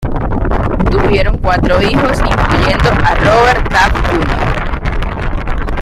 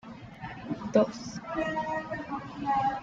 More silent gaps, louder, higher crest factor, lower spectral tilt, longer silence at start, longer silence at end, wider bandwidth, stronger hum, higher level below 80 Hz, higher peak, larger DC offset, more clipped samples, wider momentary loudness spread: neither; first, -12 LUFS vs -31 LUFS; second, 12 dB vs 20 dB; about the same, -6 dB/octave vs -6 dB/octave; about the same, 0 s vs 0.05 s; about the same, 0 s vs 0 s; first, 13 kHz vs 7.8 kHz; neither; first, -16 dBFS vs -58 dBFS; first, 0 dBFS vs -10 dBFS; neither; neither; second, 9 LU vs 15 LU